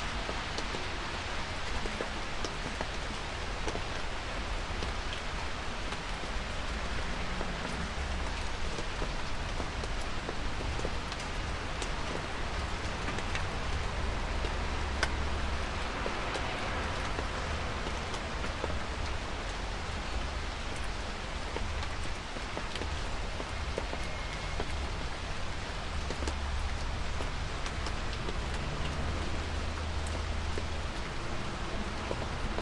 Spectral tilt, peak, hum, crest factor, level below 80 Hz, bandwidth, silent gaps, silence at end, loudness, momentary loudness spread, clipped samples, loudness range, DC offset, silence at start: -4 dB/octave; -14 dBFS; none; 20 dB; -38 dBFS; 11.5 kHz; none; 0 s; -36 LUFS; 3 LU; under 0.1%; 3 LU; under 0.1%; 0 s